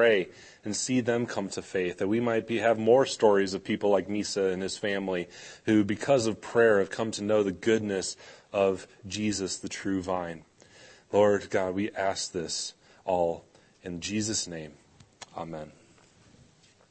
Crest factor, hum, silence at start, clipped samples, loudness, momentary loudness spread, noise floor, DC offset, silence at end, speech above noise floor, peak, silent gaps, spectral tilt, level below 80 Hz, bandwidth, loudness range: 20 dB; none; 0 s; under 0.1%; -28 LUFS; 16 LU; -60 dBFS; under 0.1%; 1.2 s; 32 dB; -8 dBFS; none; -4.5 dB/octave; -64 dBFS; 8.8 kHz; 7 LU